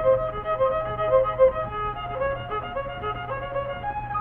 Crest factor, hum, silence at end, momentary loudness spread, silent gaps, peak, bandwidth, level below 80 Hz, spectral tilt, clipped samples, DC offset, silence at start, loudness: 18 dB; none; 0 s; 9 LU; none; -8 dBFS; 3.8 kHz; -42 dBFS; -8.5 dB/octave; under 0.1%; under 0.1%; 0 s; -25 LUFS